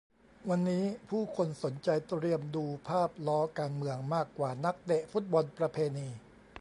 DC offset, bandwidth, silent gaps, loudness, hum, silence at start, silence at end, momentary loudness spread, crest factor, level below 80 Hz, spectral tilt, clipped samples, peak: under 0.1%; 11 kHz; none; -34 LUFS; none; 0.4 s; 0 s; 6 LU; 16 dB; -70 dBFS; -7.5 dB/octave; under 0.1%; -16 dBFS